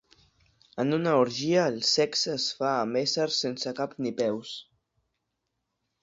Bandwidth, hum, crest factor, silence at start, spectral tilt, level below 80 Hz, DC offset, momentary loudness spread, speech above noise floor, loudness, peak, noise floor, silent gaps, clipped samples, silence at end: 7.8 kHz; none; 20 dB; 0.75 s; -4 dB/octave; -70 dBFS; under 0.1%; 8 LU; 54 dB; -27 LUFS; -10 dBFS; -81 dBFS; none; under 0.1%; 1.4 s